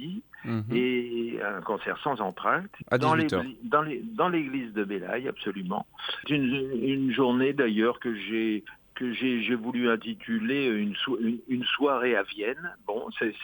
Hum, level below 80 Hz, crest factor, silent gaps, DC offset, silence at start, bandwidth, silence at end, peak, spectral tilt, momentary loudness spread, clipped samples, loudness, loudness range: none; -66 dBFS; 18 dB; none; under 0.1%; 0 s; 19.5 kHz; 0 s; -10 dBFS; -7 dB/octave; 9 LU; under 0.1%; -28 LUFS; 2 LU